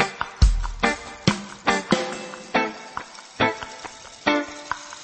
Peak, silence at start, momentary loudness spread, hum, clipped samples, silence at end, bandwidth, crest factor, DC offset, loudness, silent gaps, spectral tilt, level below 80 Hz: -4 dBFS; 0 s; 14 LU; none; under 0.1%; 0 s; 8.8 kHz; 22 dB; under 0.1%; -24 LUFS; none; -4.5 dB/octave; -30 dBFS